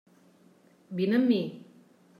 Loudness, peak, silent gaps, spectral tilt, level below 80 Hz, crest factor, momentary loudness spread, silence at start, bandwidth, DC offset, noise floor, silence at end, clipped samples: -28 LUFS; -14 dBFS; none; -8 dB/octave; -82 dBFS; 18 dB; 16 LU; 0.9 s; 5.2 kHz; under 0.1%; -60 dBFS; 0.6 s; under 0.1%